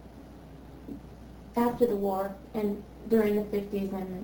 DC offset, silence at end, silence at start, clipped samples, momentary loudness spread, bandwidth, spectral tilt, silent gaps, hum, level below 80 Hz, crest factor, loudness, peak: under 0.1%; 0 s; 0 s; under 0.1%; 22 LU; over 20 kHz; -7.5 dB/octave; none; none; -52 dBFS; 18 dB; -30 LUFS; -12 dBFS